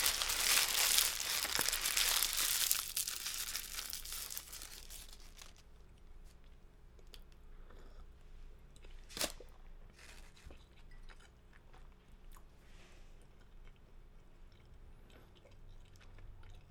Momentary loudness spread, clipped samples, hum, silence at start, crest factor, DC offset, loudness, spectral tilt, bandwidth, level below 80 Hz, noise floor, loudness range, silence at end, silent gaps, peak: 27 LU; under 0.1%; none; 0 s; 36 dB; under 0.1%; -34 LUFS; 1 dB/octave; over 20 kHz; -56 dBFS; -59 dBFS; 28 LU; 0 s; none; -6 dBFS